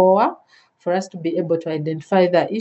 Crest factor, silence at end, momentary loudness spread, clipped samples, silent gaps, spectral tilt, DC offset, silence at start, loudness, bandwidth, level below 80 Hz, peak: 16 dB; 0 s; 9 LU; under 0.1%; none; -7 dB/octave; under 0.1%; 0 s; -20 LUFS; 8.2 kHz; -76 dBFS; -2 dBFS